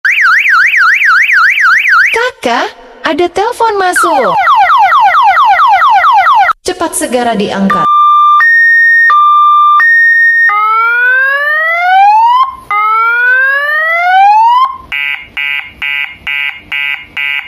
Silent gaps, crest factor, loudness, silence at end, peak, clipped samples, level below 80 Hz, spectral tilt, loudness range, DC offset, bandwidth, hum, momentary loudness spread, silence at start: none; 8 dB; -6 LUFS; 0 s; 0 dBFS; under 0.1%; -48 dBFS; -2.5 dB/octave; 4 LU; under 0.1%; 15 kHz; none; 10 LU; 0.05 s